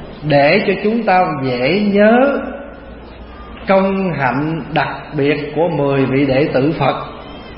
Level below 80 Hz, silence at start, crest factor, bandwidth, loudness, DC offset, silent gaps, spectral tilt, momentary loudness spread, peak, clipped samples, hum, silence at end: -40 dBFS; 0 s; 14 dB; 5.8 kHz; -15 LUFS; under 0.1%; none; -12 dB/octave; 20 LU; 0 dBFS; under 0.1%; none; 0 s